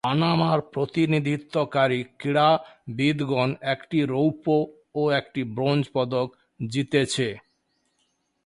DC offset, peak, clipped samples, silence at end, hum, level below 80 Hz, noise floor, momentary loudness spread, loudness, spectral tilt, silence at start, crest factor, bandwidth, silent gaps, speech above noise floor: under 0.1%; -8 dBFS; under 0.1%; 1.05 s; none; -62 dBFS; -72 dBFS; 8 LU; -24 LUFS; -6 dB/octave; 0.05 s; 18 dB; 11.5 kHz; none; 48 dB